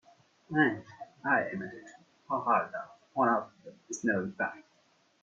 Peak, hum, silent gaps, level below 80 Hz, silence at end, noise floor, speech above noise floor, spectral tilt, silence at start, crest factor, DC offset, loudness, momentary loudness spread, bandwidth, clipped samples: -14 dBFS; none; none; -76 dBFS; 0.6 s; -68 dBFS; 38 dB; -5.5 dB/octave; 0.5 s; 20 dB; under 0.1%; -31 LUFS; 15 LU; 8 kHz; under 0.1%